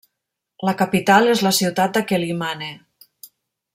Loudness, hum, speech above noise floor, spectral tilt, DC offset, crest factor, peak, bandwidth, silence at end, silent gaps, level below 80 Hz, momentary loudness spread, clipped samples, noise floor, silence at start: -18 LUFS; none; 62 dB; -4 dB/octave; under 0.1%; 18 dB; -2 dBFS; 16.5 kHz; 1 s; none; -62 dBFS; 12 LU; under 0.1%; -80 dBFS; 0.6 s